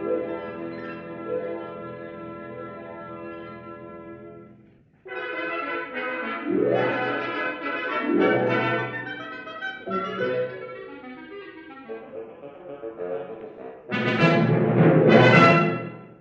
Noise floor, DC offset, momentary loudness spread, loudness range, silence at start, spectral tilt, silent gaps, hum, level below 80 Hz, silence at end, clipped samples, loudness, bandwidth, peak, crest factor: -55 dBFS; under 0.1%; 22 LU; 18 LU; 0 s; -7.5 dB/octave; none; none; -66 dBFS; 0.05 s; under 0.1%; -23 LUFS; 7.8 kHz; -2 dBFS; 22 dB